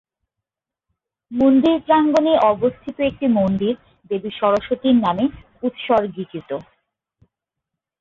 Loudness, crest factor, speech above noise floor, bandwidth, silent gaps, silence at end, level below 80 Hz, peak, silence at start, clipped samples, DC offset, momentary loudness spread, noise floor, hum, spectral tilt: -19 LUFS; 16 dB; 67 dB; 7.2 kHz; none; 1.4 s; -52 dBFS; -4 dBFS; 1.3 s; under 0.1%; under 0.1%; 14 LU; -85 dBFS; none; -7.5 dB/octave